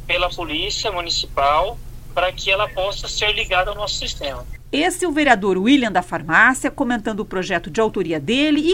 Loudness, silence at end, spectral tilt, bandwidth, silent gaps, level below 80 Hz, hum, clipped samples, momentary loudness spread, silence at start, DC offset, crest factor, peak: -19 LUFS; 0 s; -3.5 dB/octave; 16.5 kHz; none; -36 dBFS; none; under 0.1%; 9 LU; 0 s; under 0.1%; 20 dB; 0 dBFS